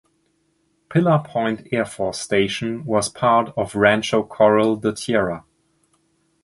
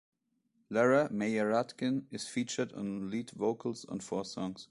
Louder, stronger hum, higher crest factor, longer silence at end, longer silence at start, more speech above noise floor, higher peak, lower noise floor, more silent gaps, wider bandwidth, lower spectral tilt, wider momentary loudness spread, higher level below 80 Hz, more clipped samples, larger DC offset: first, -20 LUFS vs -34 LUFS; neither; about the same, 20 dB vs 20 dB; first, 1.05 s vs 0.05 s; first, 0.9 s vs 0.7 s; first, 47 dB vs 43 dB; first, -2 dBFS vs -14 dBFS; second, -66 dBFS vs -76 dBFS; neither; about the same, 11.5 kHz vs 11.5 kHz; about the same, -5 dB/octave vs -5 dB/octave; second, 8 LU vs 11 LU; first, -54 dBFS vs -72 dBFS; neither; neither